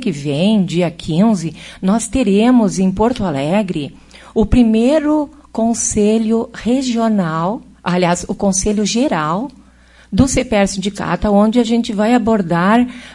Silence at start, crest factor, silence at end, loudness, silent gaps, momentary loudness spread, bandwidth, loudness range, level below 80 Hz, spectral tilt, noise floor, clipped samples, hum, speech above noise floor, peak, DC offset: 0 s; 14 dB; 0 s; -15 LUFS; none; 8 LU; 11.5 kHz; 2 LU; -34 dBFS; -5.5 dB/octave; -46 dBFS; under 0.1%; none; 31 dB; 0 dBFS; under 0.1%